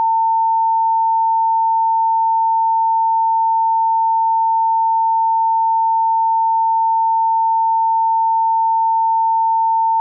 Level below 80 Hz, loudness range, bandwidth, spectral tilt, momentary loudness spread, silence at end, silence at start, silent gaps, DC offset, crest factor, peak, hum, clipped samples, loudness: under -90 dBFS; 0 LU; 1.1 kHz; -4 dB/octave; 0 LU; 0 s; 0 s; none; under 0.1%; 4 dB; -12 dBFS; none; under 0.1%; -15 LUFS